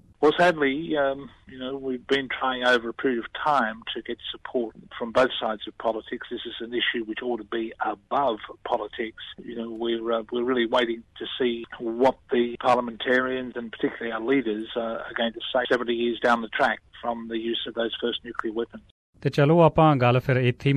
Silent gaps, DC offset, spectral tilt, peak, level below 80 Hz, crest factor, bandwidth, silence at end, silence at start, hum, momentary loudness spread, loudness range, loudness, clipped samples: 18.91-19.13 s; under 0.1%; -6.5 dB/octave; -6 dBFS; -56 dBFS; 20 dB; 11 kHz; 0 s; 0.2 s; none; 13 LU; 4 LU; -25 LUFS; under 0.1%